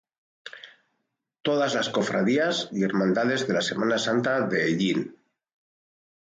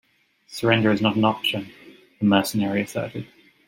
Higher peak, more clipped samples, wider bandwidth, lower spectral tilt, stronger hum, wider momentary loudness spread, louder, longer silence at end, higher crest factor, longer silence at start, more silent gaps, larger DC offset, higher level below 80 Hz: second, -12 dBFS vs -2 dBFS; neither; second, 9.4 kHz vs 16.5 kHz; about the same, -5 dB/octave vs -5.5 dB/octave; neither; about the same, 17 LU vs 18 LU; second, -25 LUFS vs -22 LUFS; first, 1.3 s vs 0.4 s; second, 14 dB vs 22 dB; about the same, 0.45 s vs 0.5 s; neither; neither; second, -70 dBFS vs -62 dBFS